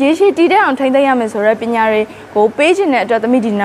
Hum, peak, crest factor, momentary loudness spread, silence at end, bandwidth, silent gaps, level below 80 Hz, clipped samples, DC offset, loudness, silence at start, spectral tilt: none; 0 dBFS; 12 dB; 4 LU; 0 s; 12.5 kHz; none; -56 dBFS; under 0.1%; under 0.1%; -12 LUFS; 0 s; -5 dB/octave